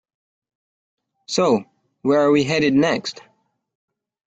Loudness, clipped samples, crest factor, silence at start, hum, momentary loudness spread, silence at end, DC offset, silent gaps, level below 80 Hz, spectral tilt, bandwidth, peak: -19 LUFS; under 0.1%; 18 dB; 1.3 s; none; 9 LU; 1.1 s; under 0.1%; none; -60 dBFS; -5 dB/octave; 9 kHz; -4 dBFS